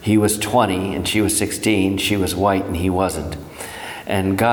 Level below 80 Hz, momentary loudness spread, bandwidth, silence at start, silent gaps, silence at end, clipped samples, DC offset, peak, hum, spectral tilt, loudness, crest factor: -40 dBFS; 13 LU; over 20 kHz; 0 s; none; 0 s; under 0.1%; under 0.1%; -2 dBFS; none; -4.5 dB/octave; -19 LUFS; 16 dB